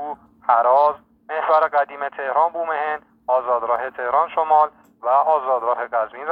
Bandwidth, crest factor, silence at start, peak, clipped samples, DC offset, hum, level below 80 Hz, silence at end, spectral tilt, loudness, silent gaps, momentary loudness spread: 5 kHz; 18 dB; 0 s; -2 dBFS; under 0.1%; under 0.1%; none; -66 dBFS; 0 s; -5.5 dB/octave; -20 LUFS; none; 10 LU